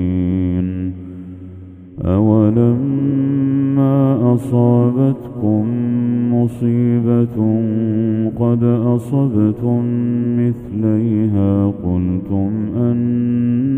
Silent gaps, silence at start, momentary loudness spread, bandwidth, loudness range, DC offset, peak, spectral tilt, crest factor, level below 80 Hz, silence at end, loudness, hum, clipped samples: none; 0 s; 6 LU; 3.5 kHz; 2 LU; under 0.1%; 0 dBFS; -11.5 dB/octave; 14 dB; -44 dBFS; 0 s; -16 LUFS; none; under 0.1%